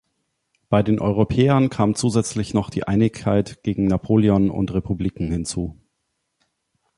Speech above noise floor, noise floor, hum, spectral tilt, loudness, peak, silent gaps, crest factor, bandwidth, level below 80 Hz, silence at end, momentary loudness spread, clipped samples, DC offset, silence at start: 55 dB; -75 dBFS; none; -7 dB/octave; -20 LUFS; -2 dBFS; none; 18 dB; 11.5 kHz; -40 dBFS; 1.25 s; 8 LU; under 0.1%; under 0.1%; 0.7 s